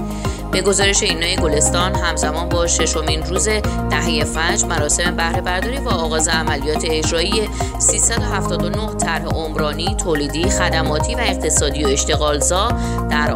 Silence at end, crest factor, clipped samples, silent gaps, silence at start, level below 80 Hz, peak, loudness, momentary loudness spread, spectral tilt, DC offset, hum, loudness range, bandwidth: 0 s; 16 dB; under 0.1%; none; 0 s; -26 dBFS; -2 dBFS; -17 LUFS; 5 LU; -3 dB/octave; under 0.1%; none; 2 LU; 16 kHz